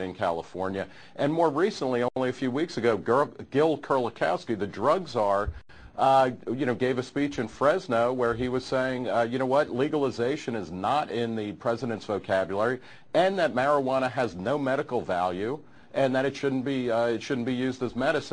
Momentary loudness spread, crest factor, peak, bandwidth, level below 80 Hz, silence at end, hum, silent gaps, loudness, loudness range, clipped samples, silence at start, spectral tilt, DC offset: 7 LU; 18 dB; -8 dBFS; 10 kHz; -54 dBFS; 0 s; none; none; -27 LUFS; 2 LU; under 0.1%; 0 s; -6 dB/octave; 0.2%